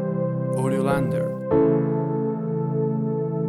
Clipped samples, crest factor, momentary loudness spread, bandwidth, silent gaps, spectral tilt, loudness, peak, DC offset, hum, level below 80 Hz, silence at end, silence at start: under 0.1%; 14 dB; 5 LU; 12.5 kHz; none; -9 dB/octave; -23 LUFS; -8 dBFS; under 0.1%; none; -52 dBFS; 0 s; 0 s